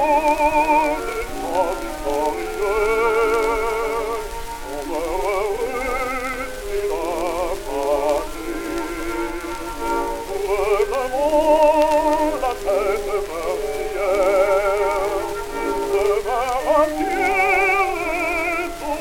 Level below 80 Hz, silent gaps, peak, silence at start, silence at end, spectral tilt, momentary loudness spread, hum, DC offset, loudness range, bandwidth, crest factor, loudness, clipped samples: -36 dBFS; none; -4 dBFS; 0 s; 0 s; -4 dB/octave; 10 LU; none; under 0.1%; 5 LU; 18.5 kHz; 16 dB; -21 LUFS; under 0.1%